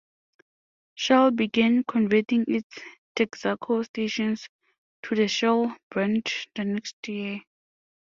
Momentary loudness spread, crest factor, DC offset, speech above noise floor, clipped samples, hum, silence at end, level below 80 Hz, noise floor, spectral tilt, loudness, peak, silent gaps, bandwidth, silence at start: 13 LU; 22 dB; under 0.1%; over 65 dB; under 0.1%; none; 0.6 s; -68 dBFS; under -90 dBFS; -5 dB/octave; -25 LUFS; -4 dBFS; 2.63-2.70 s, 2.98-3.15 s, 3.89-3.94 s, 4.49-4.59 s, 4.78-5.03 s, 5.83-5.91 s, 6.93-7.03 s; 7.4 kHz; 0.95 s